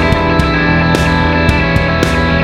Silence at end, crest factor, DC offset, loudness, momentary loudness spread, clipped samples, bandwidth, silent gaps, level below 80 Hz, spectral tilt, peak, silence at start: 0 s; 10 dB; under 0.1%; -11 LUFS; 1 LU; under 0.1%; 14 kHz; none; -20 dBFS; -6 dB/octave; 0 dBFS; 0 s